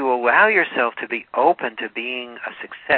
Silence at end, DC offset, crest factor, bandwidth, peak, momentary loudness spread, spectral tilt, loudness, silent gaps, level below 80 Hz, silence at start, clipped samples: 0 s; under 0.1%; 18 dB; 4.4 kHz; -2 dBFS; 17 LU; -7 dB/octave; -19 LUFS; none; -64 dBFS; 0 s; under 0.1%